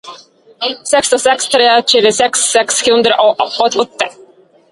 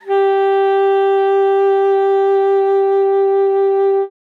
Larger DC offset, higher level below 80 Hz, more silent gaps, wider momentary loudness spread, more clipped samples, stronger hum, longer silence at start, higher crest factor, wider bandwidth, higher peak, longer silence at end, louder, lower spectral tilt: neither; first, -56 dBFS vs under -90 dBFS; neither; first, 10 LU vs 1 LU; neither; neither; about the same, 0.05 s vs 0.05 s; about the same, 12 dB vs 8 dB; first, 11.5 kHz vs 4.2 kHz; first, 0 dBFS vs -6 dBFS; first, 0.6 s vs 0.3 s; first, -11 LUFS vs -14 LUFS; second, -1 dB/octave vs -4.5 dB/octave